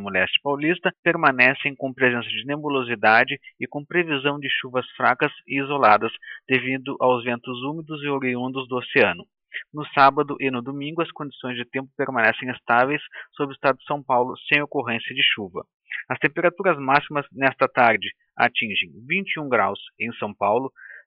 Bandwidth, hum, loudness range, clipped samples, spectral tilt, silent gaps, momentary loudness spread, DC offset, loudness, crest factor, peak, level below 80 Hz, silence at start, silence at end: 5.6 kHz; none; 3 LU; under 0.1%; -9.5 dB/octave; 0.99-1.03 s, 15.74-15.80 s; 13 LU; under 0.1%; -22 LUFS; 22 dB; -2 dBFS; -70 dBFS; 0 s; 0.05 s